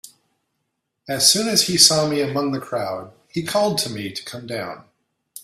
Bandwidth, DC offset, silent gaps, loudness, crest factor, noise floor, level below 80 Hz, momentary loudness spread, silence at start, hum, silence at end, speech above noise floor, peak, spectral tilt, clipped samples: 16 kHz; under 0.1%; none; -18 LUFS; 22 dB; -76 dBFS; -60 dBFS; 17 LU; 0.05 s; none; 0.05 s; 56 dB; 0 dBFS; -2.5 dB/octave; under 0.1%